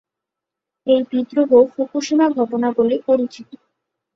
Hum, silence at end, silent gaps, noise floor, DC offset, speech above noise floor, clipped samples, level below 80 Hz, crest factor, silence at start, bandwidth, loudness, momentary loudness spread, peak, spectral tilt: none; 0.7 s; none; -84 dBFS; under 0.1%; 67 dB; under 0.1%; -64 dBFS; 16 dB; 0.85 s; 7.6 kHz; -17 LUFS; 8 LU; -2 dBFS; -5 dB/octave